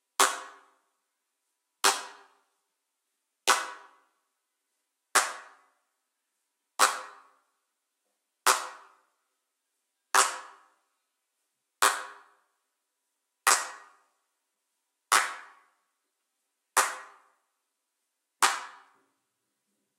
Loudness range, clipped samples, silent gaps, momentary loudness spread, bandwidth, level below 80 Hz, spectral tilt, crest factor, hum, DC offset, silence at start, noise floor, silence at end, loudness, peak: 4 LU; under 0.1%; none; 19 LU; 16 kHz; under -90 dBFS; 3 dB/octave; 28 dB; none; under 0.1%; 0.2 s; -82 dBFS; 1.25 s; -27 LUFS; -6 dBFS